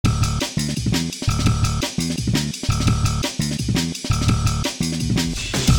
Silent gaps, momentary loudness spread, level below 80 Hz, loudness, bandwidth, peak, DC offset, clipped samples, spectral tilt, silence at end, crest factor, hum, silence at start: none; 3 LU; -28 dBFS; -21 LUFS; 18.5 kHz; -4 dBFS; 0.3%; under 0.1%; -4.5 dB/octave; 0 s; 16 dB; none; 0.05 s